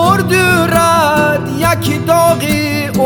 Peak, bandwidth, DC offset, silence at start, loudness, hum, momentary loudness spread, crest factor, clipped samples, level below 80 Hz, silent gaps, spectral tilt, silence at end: 0 dBFS; 17.5 kHz; under 0.1%; 0 s; -11 LUFS; none; 4 LU; 12 dB; under 0.1%; -38 dBFS; none; -5 dB/octave; 0 s